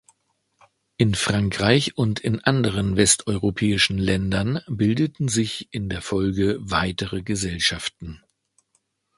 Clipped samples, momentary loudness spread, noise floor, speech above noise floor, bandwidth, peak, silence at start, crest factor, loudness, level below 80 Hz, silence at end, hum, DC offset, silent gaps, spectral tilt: under 0.1%; 9 LU; -70 dBFS; 48 dB; 11.5 kHz; 0 dBFS; 1 s; 22 dB; -22 LUFS; -42 dBFS; 1 s; none; under 0.1%; none; -4.5 dB/octave